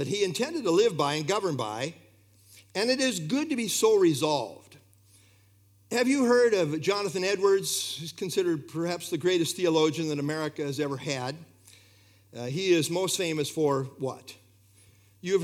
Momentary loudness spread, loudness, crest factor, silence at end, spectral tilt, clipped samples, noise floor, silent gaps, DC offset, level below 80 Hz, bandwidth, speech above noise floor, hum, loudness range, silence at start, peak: 12 LU; -27 LUFS; 18 dB; 0 s; -4 dB/octave; under 0.1%; -61 dBFS; none; under 0.1%; -78 dBFS; 16.5 kHz; 34 dB; none; 4 LU; 0 s; -10 dBFS